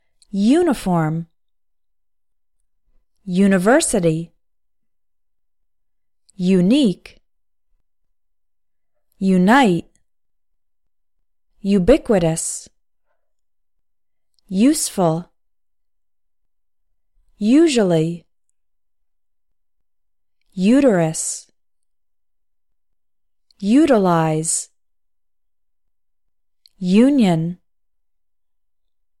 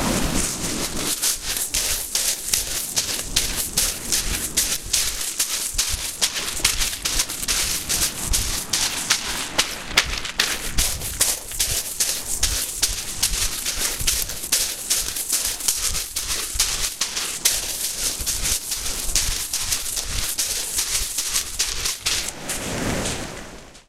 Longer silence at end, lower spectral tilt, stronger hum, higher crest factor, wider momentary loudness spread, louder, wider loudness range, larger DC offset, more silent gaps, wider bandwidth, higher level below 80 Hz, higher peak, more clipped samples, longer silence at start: first, 1.65 s vs 0.05 s; first, -5.5 dB/octave vs -0.5 dB/octave; neither; about the same, 20 dB vs 22 dB; first, 14 LU vs 4 LU; first, -17 LUFS vs -21 LUFS; about the same, 2 LU vs 1 LU; neither; neither; second, 15 kHz vs 17 kHz; second, -46 dBFS vs -34 dBFS; about the same, -2 dBFS vs -2 dBFS; neither; first, 0.35 s vs 0 s